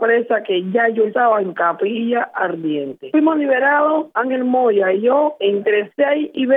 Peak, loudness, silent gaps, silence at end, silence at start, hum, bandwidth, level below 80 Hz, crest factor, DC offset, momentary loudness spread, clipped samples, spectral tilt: -4 dBFS; -17 LUFS; none; 0 s; 0 s; none; 3.9 kHz; -80 dBFS; 14 dB; under 0.1%; 5 LU; under 0.1%; -8.5 dB/octave